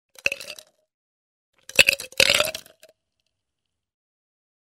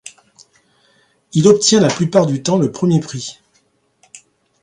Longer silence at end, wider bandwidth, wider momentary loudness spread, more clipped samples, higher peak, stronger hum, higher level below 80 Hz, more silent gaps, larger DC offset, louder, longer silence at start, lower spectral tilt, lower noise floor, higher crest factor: first, 2.25 s vs 0.45 s; first, 16 kHz vs 11 kHz; first, 21 LU vs 15 LU; neither; about the same, 0 dBFS vs 0 dBFS; neither; about the same, -56 dBFS vs -56 dBFS; first, 0.94-1.53 s vs none; neither; second, -19 LUFS vs -14 LUFS; first, 0.25 s vs 0.05 s; second, 0 dB/octave vs -5 dB/octave; first, -83 dBFS vs -60 dBFS; first, 26 dB vs 18 dB